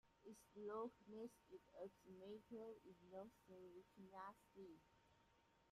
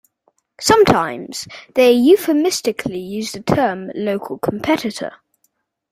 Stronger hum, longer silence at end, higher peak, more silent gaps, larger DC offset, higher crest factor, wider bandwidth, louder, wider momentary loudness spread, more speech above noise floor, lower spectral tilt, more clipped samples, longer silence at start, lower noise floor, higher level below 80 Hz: neither; second, 0 s vs 0.8 s; second, -42 dBFS vs 0 dBFS; neither; neither; about the same, 18 dB vs 16 dB; about the same, 15 kHz vs 16 kHz; second, -59 LUFS vs -17 LUFS; about the same, 12 LU vs 14 LU; second, 20 dB vs 50 dB; first, -6 dB/octave vs -4.5 dB/octave; neither; second, 0.05 s vs 0.6 s; first, -79 dBFS vs -67 dBFS; second, -86 dBFS vs -50 dBFS